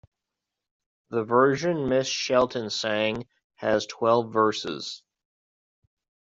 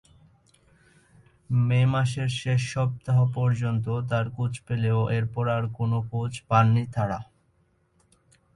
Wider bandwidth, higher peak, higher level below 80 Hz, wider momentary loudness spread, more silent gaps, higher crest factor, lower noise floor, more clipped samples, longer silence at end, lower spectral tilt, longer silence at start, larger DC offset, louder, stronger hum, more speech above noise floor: second, 7.8 kHz vs 11 kHz; about the same, -6 dBFS vs -8 dBFS; second, -62 dBFS vs -54 dBFS; first, 11 LU vs 7 LU; first, 3.44-3.50 s vs none; about the same, 20 dB vs 18 dB; first, -86 dBFS vs -66 dBFS; neither; about the same, 1.25 s vs 1.3 s; second, -4.5 dB/octave vs -7 dB/octave; second, 1.1 s vs 1.5 s; neither; about the same, -25 LUFS vs -25 LUFS; neither; first, 62 dB vs 42 dB